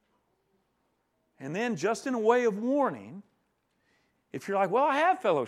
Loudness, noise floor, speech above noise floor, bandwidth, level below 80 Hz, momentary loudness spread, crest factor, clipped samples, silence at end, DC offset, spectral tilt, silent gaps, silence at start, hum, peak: -27 LUFS; -75 dBFS; 48 dB; 13.5 kHz; -84 dBFS; 18 LU; 20 dB; under 0.1%; 0 s; under 0.1%; -5.5 dB/octave; none; 1.4 s; none; -10 dBFS